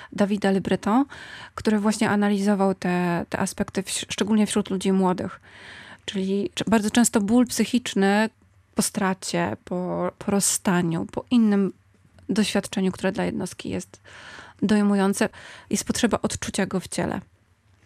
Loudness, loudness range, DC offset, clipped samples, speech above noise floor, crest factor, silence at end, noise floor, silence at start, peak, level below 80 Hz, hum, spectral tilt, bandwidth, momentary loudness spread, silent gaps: -24 LUFS; 3 LU; under 0.1%; under 0.1%; 37 dB; 18 dB; 0.65 s; -60 dBFS; 0 s; -6 dBFS; -56 dBFS; none; -4.5 dB/octave; 14.5 kHz; 12 LU; none